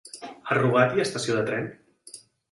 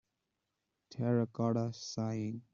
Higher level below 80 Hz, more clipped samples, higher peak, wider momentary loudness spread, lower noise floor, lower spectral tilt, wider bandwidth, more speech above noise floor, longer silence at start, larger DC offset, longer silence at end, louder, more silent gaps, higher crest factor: first, -64 dBFS vs -74 dBFS; neither; first, -6 dBFS vs -20 dBFS; first, 24 LU vs 7 LU; second, -49 dBFS vs -86 dBFS; second, -5 dB/octave vs -7.5 dB/octave; first, 11.5 kHz vs 7.4 kHz; second, 26 dB vs 51 dB; second, 0.05 s vs 0.9 s; neither; first, 0.3 s vs 0.15 s; first, -24 LUFS vs -36 LUFS; neither; about the same, 20 dB vs 18 dB